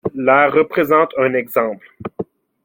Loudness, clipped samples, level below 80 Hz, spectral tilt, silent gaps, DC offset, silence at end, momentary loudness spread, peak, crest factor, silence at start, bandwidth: -15 LUFS; under 0.1%; -60 dBFS; -7 dB/octave; none; under 0.1%; 0.4 s; 18 LU; -2 dBFS; 16 dB; 0.05 s; 17 kHz